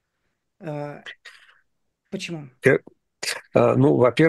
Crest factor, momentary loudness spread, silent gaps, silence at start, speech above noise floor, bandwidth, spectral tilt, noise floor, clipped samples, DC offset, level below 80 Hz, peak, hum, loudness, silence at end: 20 dB; 20 LU; none; 0.6 s; 56 dB; 12.5 kHz; -6 dB/octave; -76 dBFS; under 0.1%; under 0.1%; -62 dBFS; -2 dBFS; none; -22 LUFS; 0 s